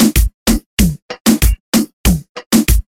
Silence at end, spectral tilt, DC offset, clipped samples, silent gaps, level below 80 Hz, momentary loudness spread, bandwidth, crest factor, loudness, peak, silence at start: 0.15 s; -4.5 dB/octave; under 0.1%; under 0.1%; 0.34-0.46 s, 0.66-0.77 s, 1.02-1.09 s, 1.21-1.25 s, 1.60-1.72 s, 1.93-2.04 s, 2.29-2.35 s, 2.46-2.51 s; -18 dBFS; 4 LU; 17 kHz; 12 dB; -15 LUFS; 0 dBFS; 0 s